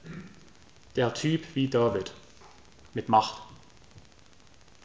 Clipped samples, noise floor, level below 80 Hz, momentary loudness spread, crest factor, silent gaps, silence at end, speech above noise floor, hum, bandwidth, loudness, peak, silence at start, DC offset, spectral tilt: under 0.1%; -57 dBFS; -60 dBFS; 22 LU; 22 dB; none; 0.85 s; 31 dB; none; 8 kHz; -28 LUFS; -8 dBFS; 0.05 s; 0.2%; -6 dB/octave